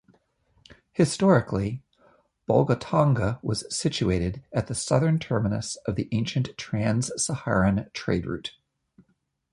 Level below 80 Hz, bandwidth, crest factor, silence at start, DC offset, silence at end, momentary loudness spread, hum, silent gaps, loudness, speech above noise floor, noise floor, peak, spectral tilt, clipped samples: -46 dBFS; 11.5 kHz; 20 dB; 0.7 s; under 0.1%; 1.05 s; 8 LU; none; none; -25 LUFS; 46 dB; -71 dBFS; -6 dBFS; -5.5 dB/octave; under 0.1%